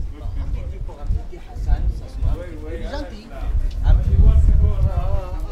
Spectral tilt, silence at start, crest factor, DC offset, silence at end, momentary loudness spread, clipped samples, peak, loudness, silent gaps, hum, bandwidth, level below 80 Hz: -8.5 dB/octave; 0 s; 16 dB; under 0.1%; 0 s; 15 LU; under 0.1%; -2 dBFS; -23 LUFS; none; none; 6 kHz; -20 dBFS